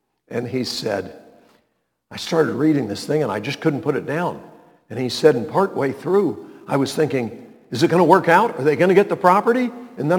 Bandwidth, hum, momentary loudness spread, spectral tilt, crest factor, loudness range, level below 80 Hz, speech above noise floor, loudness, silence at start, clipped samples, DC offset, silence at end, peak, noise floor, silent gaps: 19 kHz; none; 14 LU; -6 dB/octave; 20 dB; 6 LU; -66 dBFS; 51 dB; -19 LUFS; 0.3 s; under 0.1%; under 0.1%; 0 s; 0 dBFS; -70 dBFS; none